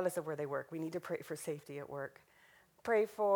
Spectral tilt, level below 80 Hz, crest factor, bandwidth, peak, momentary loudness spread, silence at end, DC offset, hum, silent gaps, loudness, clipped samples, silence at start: -5.5 dB/octave; -80 dBFS; 18 dB; over 20 kHz; -20 dBFS; 12 LU; 0 s; under 0.1%; none; none; -40 LUFS; under 0.1%; 0 s